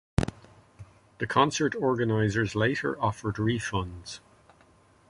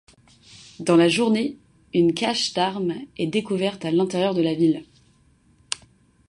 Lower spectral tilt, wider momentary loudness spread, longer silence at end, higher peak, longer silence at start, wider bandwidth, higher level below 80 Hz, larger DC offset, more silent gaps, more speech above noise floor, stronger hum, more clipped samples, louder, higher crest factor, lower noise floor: about the same, -5.5 dB/octave vs -5 dB/octave; about the same, 13 LU vs 12 LU; first, 0.9 s vs 0.55 s; second, -6 dBFS vs -2 dBFS; second, 0.2 s vs 0.55 s; about the same, 11.5 kHz vs 11.5 kHz; first, -46 dBFS vs -62 dBFS; neither; neither; second, 33 dB vs 37 dB; neither; neither; second, -28 LUFS vs -22 LUFS; about the same, 22 dB vs 20 dB; about the same, -60 dBFS vs -59 dBFS